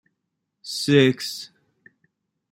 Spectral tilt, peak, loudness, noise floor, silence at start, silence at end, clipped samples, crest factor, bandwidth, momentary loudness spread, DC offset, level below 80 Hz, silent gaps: -5 dB/octave; -4 dBFS; -21 LUFS; -79 dBFS; 0.65 s; 1.05 s; under 0.1%; 22 dB; 16 kHz; 23 LU; under 0.1%; -66 dBFS; none